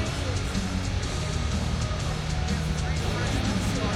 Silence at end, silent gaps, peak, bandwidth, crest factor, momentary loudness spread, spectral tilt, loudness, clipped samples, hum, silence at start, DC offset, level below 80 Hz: 0 s; none; -14 dBFS; 14.5 kHz; 14 dB; 2 LU; -5 dB/octave; -28 LUFS; under 0.1%; none; 0 s; under 0.1%; -34 dBFS